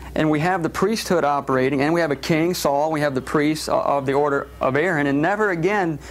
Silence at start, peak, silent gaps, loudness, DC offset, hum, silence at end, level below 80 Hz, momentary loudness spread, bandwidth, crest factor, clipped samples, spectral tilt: 0 s; -6 dBFS; none; -20 LUFS; under 0.1%; none; 0 s; -46 dBFS; 2 LU; 16 kHz; 14 dB; under 0.1%; -5.5 dB/octave